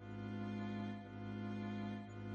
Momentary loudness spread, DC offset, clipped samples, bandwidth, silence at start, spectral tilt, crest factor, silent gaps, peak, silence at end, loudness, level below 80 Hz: 4 LU; under 0.1%; under 0.1%; 7.2 kHz; 0 s; -8 dB/octave; 12 dB; none; -34 dBFS; 0 s; -46 LUFS; -70 dBFS